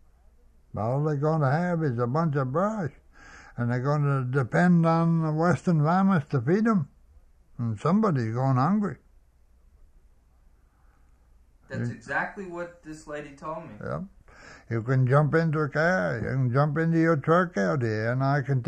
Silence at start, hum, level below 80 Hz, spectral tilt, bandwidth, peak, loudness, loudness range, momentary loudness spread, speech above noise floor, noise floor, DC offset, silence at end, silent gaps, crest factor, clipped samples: 0.75 s; none; -56 dBFS; -8.5 dB/octave; 9 kHz; -8 dBFS; -25 LUFS; 12 LU; 15 LU; 34 dB; -59 dBFS; under 0.1%; 0 s; none; 18 dB; under 0.1%